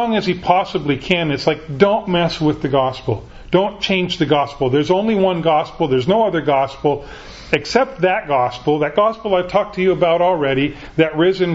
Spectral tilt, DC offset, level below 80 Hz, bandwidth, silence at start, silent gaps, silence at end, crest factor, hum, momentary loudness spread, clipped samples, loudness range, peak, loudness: -6.5 dB/octave; under 0.1%; -44 dBFS; 8 kHz; 0 s; none; 0 s; 16 dB; none; 5 LU; under 0.1%; 1 LU; 0 dBFS; -17 LUFS